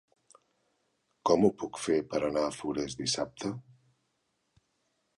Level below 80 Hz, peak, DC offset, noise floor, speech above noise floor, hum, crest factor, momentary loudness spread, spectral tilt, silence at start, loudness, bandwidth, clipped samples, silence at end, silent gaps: -64 dBFS; -12 dBFS; under 0.1%; -78 dBFS; 48 dB; none; 22 dB; 12 LU; -4.5 dB/octave; 1.25 s; -31 LUFS; 11.5 kHz; under 0.1%; 1.55 s; none